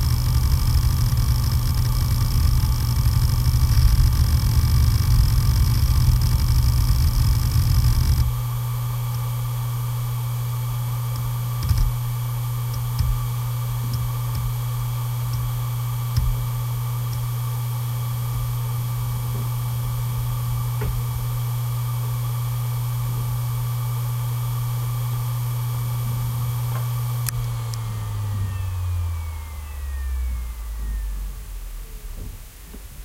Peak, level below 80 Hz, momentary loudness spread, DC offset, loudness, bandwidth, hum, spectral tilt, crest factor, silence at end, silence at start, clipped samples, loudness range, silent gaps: -2 dBFS; -26 dBFS; 9 LU; under 0.1%; -23 LUFS; 16.5 kHz; none; -5.5 dB/octave; 20 dB; 0 s; 0 s; under 0.1%; 8 LU; none